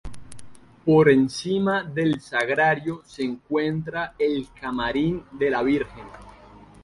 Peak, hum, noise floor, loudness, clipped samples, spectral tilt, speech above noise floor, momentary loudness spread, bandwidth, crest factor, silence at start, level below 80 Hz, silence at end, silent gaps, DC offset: -4 dBFS; none; -48 dBFS; -23 LUFS; under 0.1%; -6.5 dB/octave; 25 dB; 13 LU; 11.5 kHz; 20 dB; 0.05 s; -50 dBFS; 0.25 s; none; under 0.1%